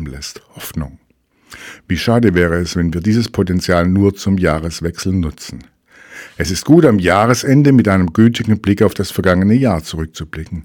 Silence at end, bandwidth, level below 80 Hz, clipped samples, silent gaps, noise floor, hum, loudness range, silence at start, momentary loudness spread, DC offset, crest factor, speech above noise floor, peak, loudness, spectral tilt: 0 s; 18.5 kHz; -36 dBFS; 0.2%; none; -38 dBFS; none; 5 LU; 0 s; 19 LU; under 0.1%; 14 dB; 24 dB; 0 dBFS; -14 LUFS; -6.5 dB/octave